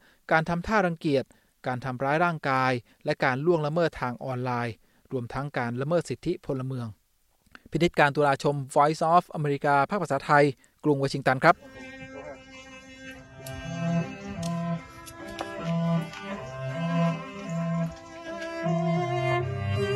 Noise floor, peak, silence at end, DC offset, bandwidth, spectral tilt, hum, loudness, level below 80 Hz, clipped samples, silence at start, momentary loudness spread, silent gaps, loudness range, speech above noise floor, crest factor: -66 dBFS; -4 dBFS; 0 s; under 0.1%; 12.5 kHz; -6.5 dB/octave; none; -27 LUFS; -56 dBFS; under 0.1%; 0.3 s; 19 LU; none; 8 LU; 41 dB; 22 dB